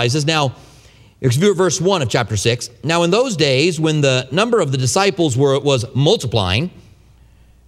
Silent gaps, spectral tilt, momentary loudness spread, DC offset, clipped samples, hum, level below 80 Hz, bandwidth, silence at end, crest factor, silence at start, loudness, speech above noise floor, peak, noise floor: none; -4.5 dB/octave; 4 LU; under 0.1%; under 0.1%; none; -48 dBFS; 14.5 kHz; 0.9 s; 16 dB; 0 s; -16 LUFS; 32 dB; 0 dBFS; -48 dBFS